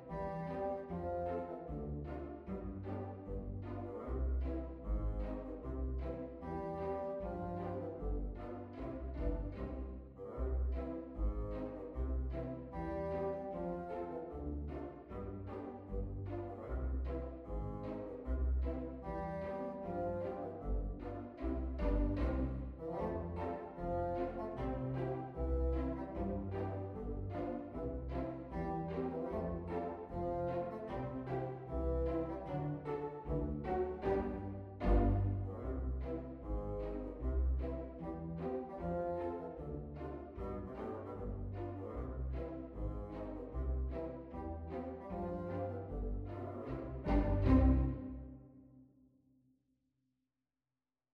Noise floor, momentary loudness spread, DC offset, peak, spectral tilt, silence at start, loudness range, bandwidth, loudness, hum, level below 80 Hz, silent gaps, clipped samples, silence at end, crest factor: under -90 dBFS; 8 LU; under 0.1%; -18 dBFS; -10.5 dB/octave; 0 s; 7 LU; 4.9 kHz; -41 LUFS; none; -44 dBFS; none; under 0.1%; 2.3 s; 22 dB